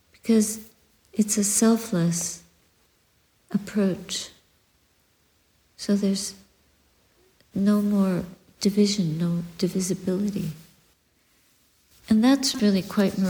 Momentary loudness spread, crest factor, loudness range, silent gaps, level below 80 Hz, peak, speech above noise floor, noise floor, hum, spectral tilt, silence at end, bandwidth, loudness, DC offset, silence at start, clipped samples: 13 LU; 16 dB; 7 LU; none; -60 dBFS; -8 dBFS; 42 dB; -65 dBFS; none; -5 dB/octave; 0 s; over 20 kHz; -24 LUFS; under 0.1%; 0.25 s; under 0.1%